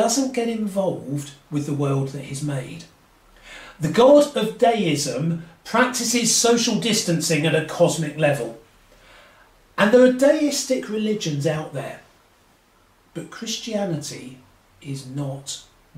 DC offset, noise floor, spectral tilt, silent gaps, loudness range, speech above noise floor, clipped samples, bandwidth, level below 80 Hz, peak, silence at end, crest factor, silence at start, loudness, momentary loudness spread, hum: under 0.1%; -57 dBFS; -4 dB/octave; none; 12 LU; 37 dB; under 0.1%; 16 kHz; -58 dBFS; -4 dBFS; 0.35 s; 18 dB; 0 s; -21 LUFS; 19 LU; none